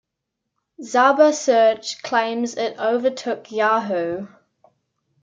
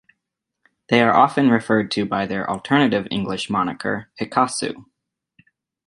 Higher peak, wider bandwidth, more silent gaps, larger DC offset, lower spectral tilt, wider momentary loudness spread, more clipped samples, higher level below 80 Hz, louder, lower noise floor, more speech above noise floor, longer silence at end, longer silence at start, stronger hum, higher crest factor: about the same, -4 dBFS vs -2 dBFS; second, 9.2 kHz vs 11 kHz; neither; neither; second, -3.5 dB/octave vs -5 dB/octave; about the same, 12 LU vs 11 LU; neither; second, -70 dBFS vs -58 dBFS; about the same, -19 LUFS vs -20 LUFS; about the same, -80 dBFS vs -80 dBFS; about the same, 61 dB vs 61 dB; about the same, 0.95 s vs 1.05 s; about the same, 0.8 s vs 0.9 s; neither; about the same, 18 dB vs 20 dB